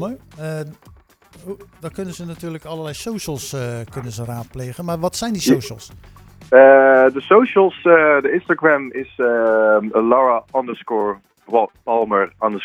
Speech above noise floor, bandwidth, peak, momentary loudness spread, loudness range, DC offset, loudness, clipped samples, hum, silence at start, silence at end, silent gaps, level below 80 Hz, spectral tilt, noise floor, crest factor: 31 dB; 16.5 kHz; 0 dBFS; 18 LU; 16 LU; under 0.1%; -16 LUFS; under 0.1%; none; 0 s; 0 s; none; -52 dBFS; -5.5 dB/octave; -48 dBFS; 18 dB